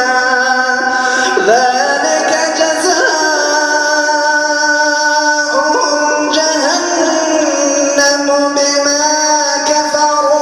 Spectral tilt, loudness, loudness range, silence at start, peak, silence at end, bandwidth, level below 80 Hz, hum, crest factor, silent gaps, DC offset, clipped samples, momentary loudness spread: 0 dB/octave; -11 LUFS; 0 LU; 0 s; 0 dBFS; 0 s; 13.5 kHz; -58 dBFS; none; 12 dB; none; under 0.1%; under 0.1%; 2 LU